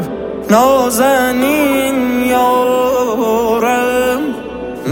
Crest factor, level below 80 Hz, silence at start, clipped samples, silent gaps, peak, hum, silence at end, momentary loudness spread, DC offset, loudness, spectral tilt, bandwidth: 12 dB; -42 dBFS; 0 s; under 0.1%; none; 0 dBFS; none; 0 s; 10 LU; under 0.1%; -13 LUFS; -4 dB/octave; 17 kHz